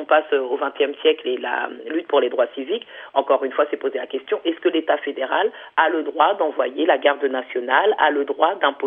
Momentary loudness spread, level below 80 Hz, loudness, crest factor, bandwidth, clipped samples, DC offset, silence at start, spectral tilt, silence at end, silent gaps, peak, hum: 8 LU; -80 dBFS; -21 LUFS; 18 dB; 3.8 kHz; under 0.1%; under 0.1%; 0 s; -6 dB/octave; 0 s; none; -2 dBFS; none